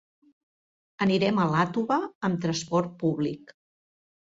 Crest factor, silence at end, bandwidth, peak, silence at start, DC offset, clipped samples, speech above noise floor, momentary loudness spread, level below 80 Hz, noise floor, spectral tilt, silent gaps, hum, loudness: 18 dB; 0.85 s; 7.8 kHz; -10 dBFS; 1 s; under 0.1%; under 0.1%; over 64 dB; 7 LU; -66 dBFS; under -90 dBFS; -6 dB/octave; 2.15-2.21 s; none; -26 LUFS